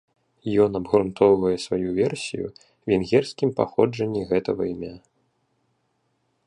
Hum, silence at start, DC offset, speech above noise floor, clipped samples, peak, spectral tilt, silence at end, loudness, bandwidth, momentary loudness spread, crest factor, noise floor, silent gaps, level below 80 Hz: none; 0.45 s; under 0.1%; 49 dB; under 0.1%; -4 dBFS; -6.5 dB/octave; 1.5 s; -23 LUFS; 11 kHz; 14 LU; 20 dB; -71 dBFS; none; -54 dBFS